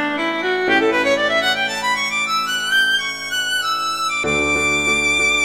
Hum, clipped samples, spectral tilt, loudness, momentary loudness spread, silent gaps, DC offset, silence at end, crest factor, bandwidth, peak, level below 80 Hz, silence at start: none; under 0.1%; -1.5 dB/octave; -17 LUFS; 4 LU; none; 0.2%; 0 s; 14 dB; 17 kHz; -4 dBFS; -46 dBFS; 0 s